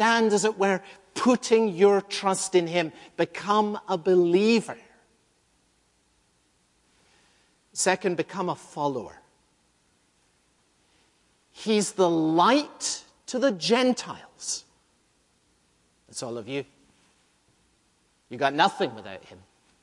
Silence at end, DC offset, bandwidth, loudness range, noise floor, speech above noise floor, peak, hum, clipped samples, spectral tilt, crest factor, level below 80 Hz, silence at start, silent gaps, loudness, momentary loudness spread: 0.5 s; under 0.1%; 11.5 kHz; 14 LU; -67 dBFS; 43 dB; -4 dBFS; none; under 0.1%; -4 dB/octave; 22 dB; -72 dBFS; 0 s; none; -25 LUFS; 16 LU